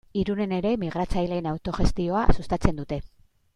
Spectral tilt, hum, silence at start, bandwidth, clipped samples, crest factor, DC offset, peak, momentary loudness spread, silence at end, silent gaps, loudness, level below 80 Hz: -7.5 dB/octave; none; 0.15 s; 10.5 kHz; under 0.1%; 22 dB; under 0.1%; -4 dBFS; 5 LU; 0.5 s; none; -27 LUFS; -32 dBFS